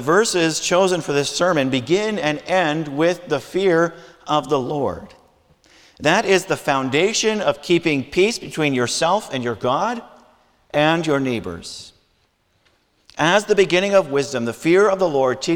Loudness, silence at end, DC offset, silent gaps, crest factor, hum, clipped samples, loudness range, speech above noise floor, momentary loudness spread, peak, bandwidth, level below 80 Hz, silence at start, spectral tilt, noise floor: -19 LUFS; 0 s; under 0.1%; none; 18 dB; none; under 0.1%; 4 LU; 45 dB; 8 LU; -2 dBFS; 18 kHz; -54 dBFS; 0 s; -4 dB/octave; -63 dBFS